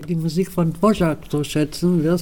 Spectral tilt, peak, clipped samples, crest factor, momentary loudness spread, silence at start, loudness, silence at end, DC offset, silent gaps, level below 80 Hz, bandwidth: -7 dB/octave; -4 dBFS; under 0.1%; 16 dB; 5 LU; 0 s; -20 LUFS; 0 s; 1%; none; -42 dBFS; 17.5 kHz